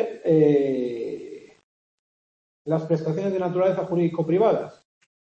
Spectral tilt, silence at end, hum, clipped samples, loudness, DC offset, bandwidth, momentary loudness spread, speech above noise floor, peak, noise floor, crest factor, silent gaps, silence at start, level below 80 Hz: -9 dB/octave; 0.5 s; none; under 0.1%; -23 LUFS; under 0.1%; 7.8 kHz; 15 LU; over 69 dB; -8 dBFS; under -90 dBFS; 16 dB; 1.64-2.65 s; 0 s; -68 dBFS